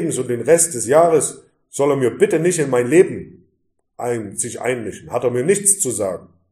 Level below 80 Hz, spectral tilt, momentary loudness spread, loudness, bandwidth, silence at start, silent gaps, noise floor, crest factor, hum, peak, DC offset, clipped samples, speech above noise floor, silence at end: -60 dBFS; -4.5 dB/octave; 11 LU; -17 LUFS; 15 kHz; 0 s; none; -67 dBFS; 18 dB; none; 0 dBFS; under 0.1%; under 0.1%; 50 dB; 0.3 s